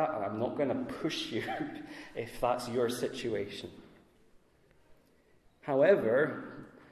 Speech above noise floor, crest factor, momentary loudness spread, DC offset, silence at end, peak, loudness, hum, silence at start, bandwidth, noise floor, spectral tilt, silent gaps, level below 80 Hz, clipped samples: 33 dB; 20 dB; 18 LU; under 0.1%; 0.1 s; -12 dBFS; -32 LUFS; none; 0 s; 14 kHz; -66 dBFS; -5.5 dB/octave; none; -64 dBFS; under 0.1%